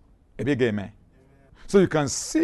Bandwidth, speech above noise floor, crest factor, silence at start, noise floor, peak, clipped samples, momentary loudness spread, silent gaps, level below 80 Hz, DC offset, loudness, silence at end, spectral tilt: 12.5 kHz; 33 dB; 20 dB; 0.4 s; -55 dBFS; -6 dBFS; under 0.1%; 12 LU; none; -50 dBFS; under 0.1%; -24 LUFS; 0 s; -5 dB/octave